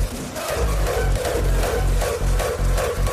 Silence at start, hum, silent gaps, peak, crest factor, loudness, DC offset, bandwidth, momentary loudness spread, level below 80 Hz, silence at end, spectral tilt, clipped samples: 0 s; none; none; -8 dBFS; 12 dB; -23 LUFS; under 0.1%; 15.5 kHz; 3 LU; -22 dBFS; 0 s; -4.5 dB/octave; under 0.1%